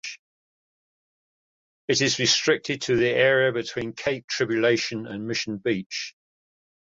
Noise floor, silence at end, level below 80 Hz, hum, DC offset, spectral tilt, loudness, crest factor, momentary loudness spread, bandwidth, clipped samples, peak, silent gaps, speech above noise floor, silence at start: under -90 dBFS; 0.75 s; -62 dBFS; none; under 0.1%; -3.5 dB/octave; -23 LUFS; 18 dB; 13 LU; 7.8 kHz; under 0.1%; -6 dBFS; 0.19-1.88 s, 4.24-4.28 s, 5.86-5.90 s; over 66 dB; 0.05 s